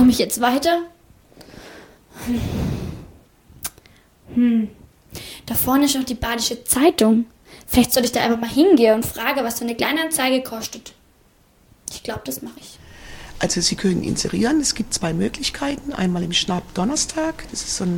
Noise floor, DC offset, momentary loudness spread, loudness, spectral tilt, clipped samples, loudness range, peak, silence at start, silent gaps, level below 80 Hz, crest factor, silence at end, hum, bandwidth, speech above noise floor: -56 dBFS; under 0.1%; 18 LU; -20 LUFS; -4 dB/octave; under 0.1%; 9 LU; -2 dBFS; 0 s; none; -42 dBFS; 18 dB; 0 s; none; 19.5 kHz; 36 dB